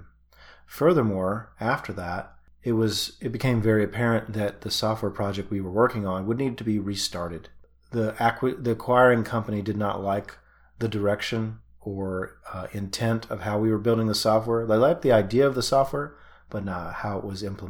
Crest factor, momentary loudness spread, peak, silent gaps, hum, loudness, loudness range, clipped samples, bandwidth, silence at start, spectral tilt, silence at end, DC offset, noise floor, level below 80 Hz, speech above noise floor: 20 dB; 13 LU; -6 dBFS; none; none; -25 LUFS; 6 LU; under 0.1%; 18.5 kHz; 0 s; -6 dB/octave; 0 s; under 0.1%; -52 dBFS; -54 dBFS; 28 dB